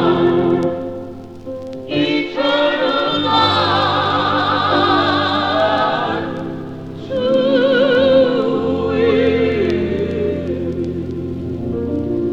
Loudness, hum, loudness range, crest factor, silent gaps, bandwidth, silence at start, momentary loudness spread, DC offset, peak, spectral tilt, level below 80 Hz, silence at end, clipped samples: -16 LUFS; none; 3 LU; 16 dB; none; 8.2 kHz; 0 s; 13 LU; 0.6%; -2 dBFS; -6.5 dB/octave; -44 dBFS; 0 s; under 0.1%